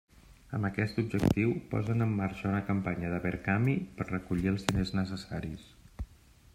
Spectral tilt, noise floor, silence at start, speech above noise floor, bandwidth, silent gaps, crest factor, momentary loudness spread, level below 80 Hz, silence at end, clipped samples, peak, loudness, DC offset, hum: -7 dB/octave; -58 dBFS; 0.3 s; 27 dB; 16 kHz; none; 24 dB; 12 LU; -50 dBFS; 0.5 s; under 0.1%; -8 dBFS; -32 LUFS; under 0.1%; none